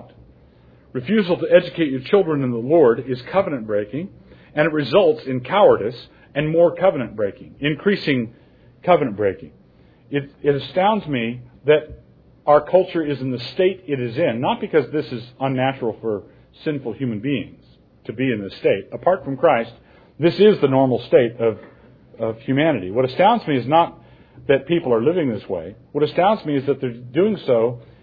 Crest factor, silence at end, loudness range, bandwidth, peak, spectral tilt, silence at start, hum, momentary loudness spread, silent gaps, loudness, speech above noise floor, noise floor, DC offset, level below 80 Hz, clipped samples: 18 dB; 0.2 s; 4 LU; 5 kHz; -2 dBFS; -9 dB/octave; 0 s; none; 13 LU; none; -20 LUFS; 32 dB; -51 dBFS; under 0.1%; -54 dBFS; under 0.1%